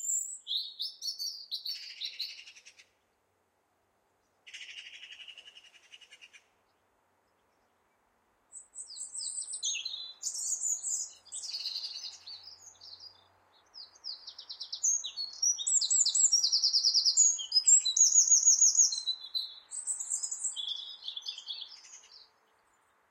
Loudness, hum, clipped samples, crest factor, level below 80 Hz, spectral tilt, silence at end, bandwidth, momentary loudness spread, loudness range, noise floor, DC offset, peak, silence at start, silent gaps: -27 LUFS; none; under 0.1%; 20 dB; -84 dBFS; 6 dB/octave; 1.15 s; 16 kHz; 24 LU; 22 LU; -75 dBFS; under 0.1%; -12 dBFS; 0 s; none